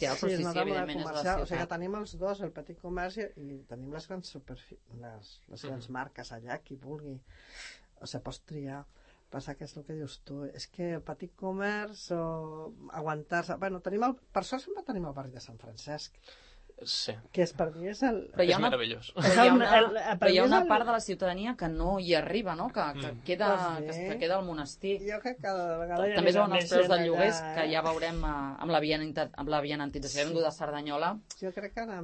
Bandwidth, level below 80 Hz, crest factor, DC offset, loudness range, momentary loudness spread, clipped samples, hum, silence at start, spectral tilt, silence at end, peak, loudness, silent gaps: 8.8 kHz; -50 dBFS; 24 dB; under 0.1%; 18 LU; 19 LU; under 0.1%; none; 0 s; -5 dB/octave; 0 s; -8 dBFS; -30 LUFS; none